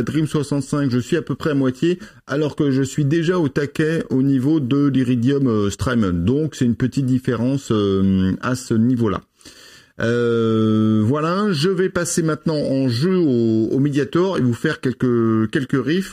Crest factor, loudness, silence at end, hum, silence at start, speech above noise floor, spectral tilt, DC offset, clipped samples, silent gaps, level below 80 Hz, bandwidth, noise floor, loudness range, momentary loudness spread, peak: 12 dB; -19 LUFS; 0 s; none; 0 s; 27 dB; -6.5 dB/octave; under 0.1%; under 0.1%; none; -48 dBFS; 14.5 kHz; -45 dBFS; 2 LU; 4 LU; -6 dBFS